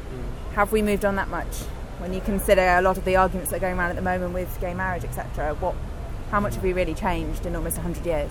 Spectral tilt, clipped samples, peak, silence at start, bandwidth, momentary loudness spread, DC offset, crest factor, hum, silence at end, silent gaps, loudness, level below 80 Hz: -5.5 dB/octave; under 0.1%; -4 dBFS; 0 s; 17.5 kHz; 13 LU; under 0.1%; 20 dB; none; 0 s; none; -25 LUFS; -32 dBFS